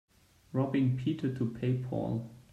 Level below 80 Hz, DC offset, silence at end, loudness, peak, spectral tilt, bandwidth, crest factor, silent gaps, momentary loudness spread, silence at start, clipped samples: -62 dBFS; under 0.1%; 0.1 s; -33 LUFS; -18 dBFS; -9 dB/octave; 7.4 kHz; 16 dB; none; 7 LU; 0.5 s; under 0.1%